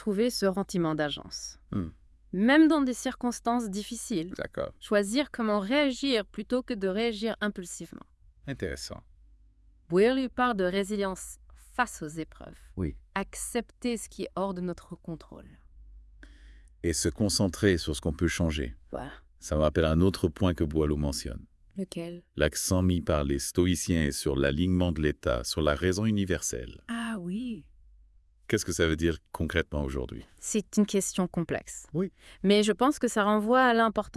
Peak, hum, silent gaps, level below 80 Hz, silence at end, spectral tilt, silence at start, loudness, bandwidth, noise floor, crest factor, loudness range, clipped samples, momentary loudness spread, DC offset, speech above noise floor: -10 dBFS; none; none; -46 dBFS; 0.05 s; -5 dB/octave; 0 s; -29 LUFS; 12 kHz; -60 dBFS; 20 dB; 7 LU; under 0.1%; 15 LU; under 0.1%; 31 dB